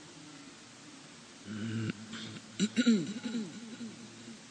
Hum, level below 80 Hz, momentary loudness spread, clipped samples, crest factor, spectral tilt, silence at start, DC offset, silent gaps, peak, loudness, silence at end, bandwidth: none; -78 dBFS; 21 LU; under 0.1%; 22 dB; -4.5 dB/octave; 0 s; under 0.1%; none; -16 dBFS; -35 LUFS; 0 s; 9.8 kHz